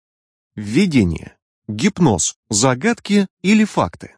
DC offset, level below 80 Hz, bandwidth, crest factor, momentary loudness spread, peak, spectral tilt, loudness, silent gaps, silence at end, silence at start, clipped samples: under 0.1%; -44 dBFS; 10.5 kHz; 16 dB; 12 LU; -2 dBFS; -4.5 dB/octave; -17 LUFS; 1.42-1.62 s, 2.36-2.43 s, 3.30-3.37 s; 0.1 s; 0.55 s; under 0.1%